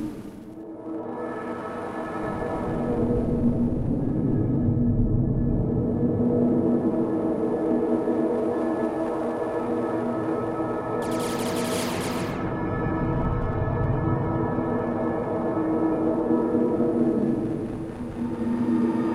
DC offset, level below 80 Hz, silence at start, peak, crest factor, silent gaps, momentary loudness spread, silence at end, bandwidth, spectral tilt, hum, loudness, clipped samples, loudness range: under 0.1%; -38 dBFS; 0 s; -8 dBFS; 16 dB; none; 9 LU; 0 s; 15 kHz; -7.5 dB/octave; none; -25 LUFS; under 0.1%; 3 LU